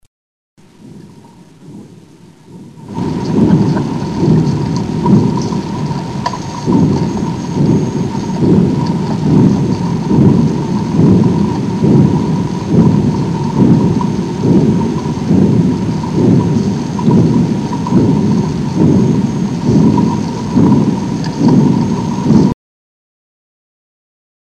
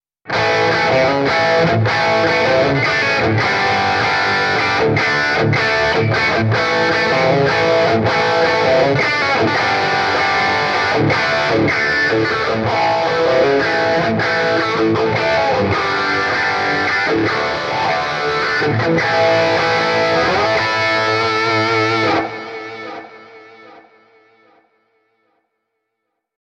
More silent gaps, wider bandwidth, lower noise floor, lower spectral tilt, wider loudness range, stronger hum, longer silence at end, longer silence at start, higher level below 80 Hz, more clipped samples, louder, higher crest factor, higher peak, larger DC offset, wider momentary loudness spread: neither; about the same, 9.8 kHz vs 9.8 kHz; second, -39 dBFS vs -75 dBFS; first, -8 dB/octave vs -5 dB/octave; about the same, 4 LU vs 2 LU; neither; second, 1.9 s vs 2.65 s; first, 0.85 s vs 0.25 s; first, -36 dBFS vs -46 dBFS; neither; first, -12 LUFS vs -15 LUFS; about the same, 12 dB vs 14 dB; about the same, 0 dBFS vs -2 dBFS; first, 0.2% vs under 0.1%; first, 8 LU vs 3 LU